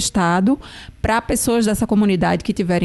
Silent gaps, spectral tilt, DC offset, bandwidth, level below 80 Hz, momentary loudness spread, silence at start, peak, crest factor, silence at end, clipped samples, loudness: none; -5 dB/octave; under 0.1%; 12.5 kHz; -38 dBFS; 6 LU; 0 s; -8 dBFS; 10 dB; 0 s; under 0.1%; -18 LUFS